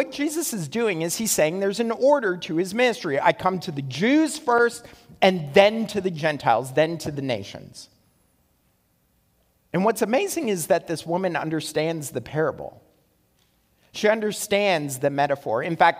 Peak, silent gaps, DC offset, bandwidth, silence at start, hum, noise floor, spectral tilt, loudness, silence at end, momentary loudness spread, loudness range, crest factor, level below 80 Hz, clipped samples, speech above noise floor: 0 dBFS; none; under 0.1%; 16 kHz; 0 s; none; -66 dBFS; -4.5 dB/octave; -23 LUFS; 0 s; 9 LU; 7 LU; 22 dB; -62 dBFS; under 0.1%; 43 dB